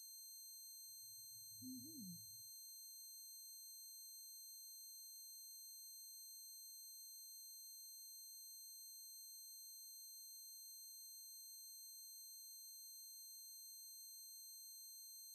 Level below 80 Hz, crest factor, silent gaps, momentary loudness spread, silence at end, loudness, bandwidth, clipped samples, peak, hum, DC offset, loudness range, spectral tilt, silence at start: under -90 dBFS; 14 dB; none; 1 LU; 0 s; -54 LUFS; 13 kHz; under 0.1%; -44 dBFS; none; under 0.1%; 0 LU; -0.5 dB/octave; 0 s